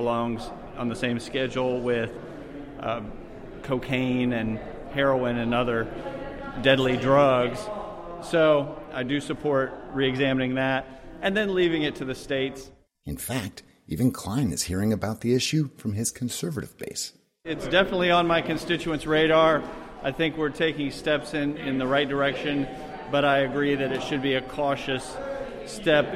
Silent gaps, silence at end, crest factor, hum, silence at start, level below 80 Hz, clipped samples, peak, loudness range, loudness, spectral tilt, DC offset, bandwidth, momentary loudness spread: none; 0 s; 20 dB; none; 0 s; -48 dBFS; under 0.1%; -6 dBFS; 5 LU; -26 LUFS; -5 dB/octave; under 0.1%; 16 kHz; 14 LU